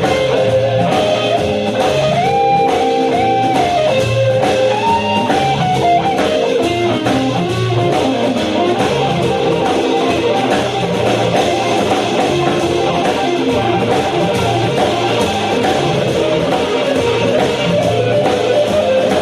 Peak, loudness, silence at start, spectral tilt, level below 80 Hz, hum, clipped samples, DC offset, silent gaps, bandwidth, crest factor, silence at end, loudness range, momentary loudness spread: -2 dBFS; -14 LUFS; 0 s; -5.5 dB/octave; -42 dBFS; none; under 0.1%; under 0.1%; none; 13 kHz; 12 dB; 0 s; 1 LU; 2 LU